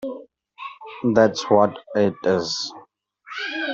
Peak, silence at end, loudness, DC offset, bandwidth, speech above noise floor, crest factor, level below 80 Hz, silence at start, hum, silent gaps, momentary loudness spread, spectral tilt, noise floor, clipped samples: -2 dBFS; 0 s; -21 LUFS; under 0.1%; 7.8 kHz; 32 dB; 20 dB; -62 dBFS; 0 s; none; none; 19 LU; -5 dB/octave; -52 dBFS; under 0.1%